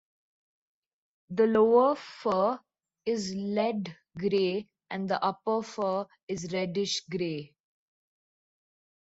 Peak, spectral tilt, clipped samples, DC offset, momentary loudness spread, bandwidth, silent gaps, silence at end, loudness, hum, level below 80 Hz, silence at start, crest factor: -12 dBFS; -5 dB/octave; under 0.1%; under 0.1%; 14 LU; 8 kHz; 6.23-6.28 s; 1.65 s; -29 LUFS; none; -72 dBFS; 1.3 s; 20 dB